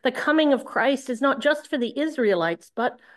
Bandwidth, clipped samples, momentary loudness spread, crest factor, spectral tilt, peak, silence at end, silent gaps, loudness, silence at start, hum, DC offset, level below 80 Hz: 12.5 kHz; under 0.1%; 7 LU; 16 dB; -4.5 dB/octave; -8 dBFS; 0.2 s; none; -23 LUFS; 0.05 s; none; under 0.1%; -76 dBFS